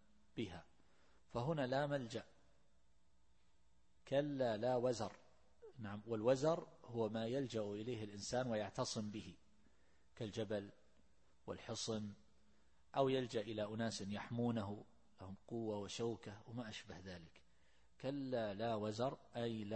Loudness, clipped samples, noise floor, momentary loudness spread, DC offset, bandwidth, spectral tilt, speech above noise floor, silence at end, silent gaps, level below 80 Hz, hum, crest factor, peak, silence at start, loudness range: -43 LUFS; under 0.1%; -78 dBFS; 15 LU; under 0.1%; 8.4 kHz; -5.5 dB/octave; 35 dB; 0 s; none; -74 dBFS; none; 22 dB; -24 dBFS; 0.35 s; 7 LU